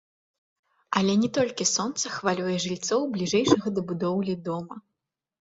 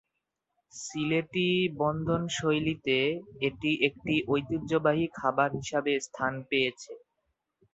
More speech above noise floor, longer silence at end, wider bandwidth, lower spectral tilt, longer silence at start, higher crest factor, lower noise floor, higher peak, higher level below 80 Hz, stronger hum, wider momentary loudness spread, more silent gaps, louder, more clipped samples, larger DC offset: first, 59 dB vs 55 dB; second, 0.6 s vs 0.75 s; about the same, 8 kHz vs 8.2 kHz; about the same, -4 dB/octave vs -5 dB/octave; first, 0.9 s vs 0.75 s; about the same, 22 dB vs 20 dB; about the same, -84 dBFS vs -84 dBFS; first, -4 dBFS vs -10 dBFS; about the same, -64 dBFS vs -60 dBFS; neither; about the same, 8 LU vs 6 LU; neither; first, -26 LUFS vs -29 LUFS; neither; neither